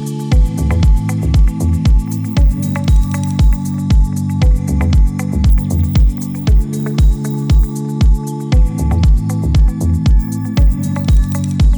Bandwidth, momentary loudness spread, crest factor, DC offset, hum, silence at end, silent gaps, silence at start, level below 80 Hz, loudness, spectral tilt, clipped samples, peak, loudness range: over 20 kHz; 4 LU; 10 dB; under 0.1%; none; 0 s; none; 0 s; -14 dBFS; -15 LUFS; -7 dB/octave; under 0.1%; 0 dBFS; 1 LU